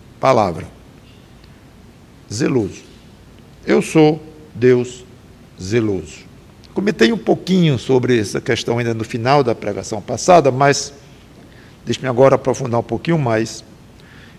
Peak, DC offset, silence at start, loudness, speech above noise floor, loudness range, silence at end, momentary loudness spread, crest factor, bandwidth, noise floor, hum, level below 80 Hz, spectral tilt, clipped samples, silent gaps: 0 dBFS; under 0.1%; 0.2 s; -17 LUFS; 27 dB; 4 LU; 0.2 s; 17 LU; 18 dB; 13.5 kHz; -43 dBFS; none; -46 dBFS; -5.5 dB/octave; under 0.1%; none